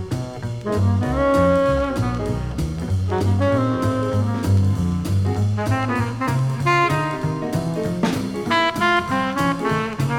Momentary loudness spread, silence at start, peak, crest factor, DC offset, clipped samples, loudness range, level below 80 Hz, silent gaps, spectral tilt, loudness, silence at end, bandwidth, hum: 7 LU; 0 s; -4 dBFS; 14 dB; under 0.1%; under 0.1%; 1 LU; -36 dBFS; none; -6.5 dB/octave; -21 LUFS; 0 s; 15.5 kHz; none